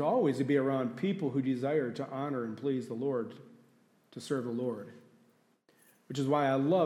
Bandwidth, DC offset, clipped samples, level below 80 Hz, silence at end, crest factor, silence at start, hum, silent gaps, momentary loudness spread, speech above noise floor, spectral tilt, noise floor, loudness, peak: 12.5 kHz; under 0.1%; under 0.1%; -84 dBFS; 0 s; 16 dB; 0 s; none; none; 15 LU; 37 dB; -7.5 dB/octave; -68 dBFS; -33 LUFS; -16 dBFS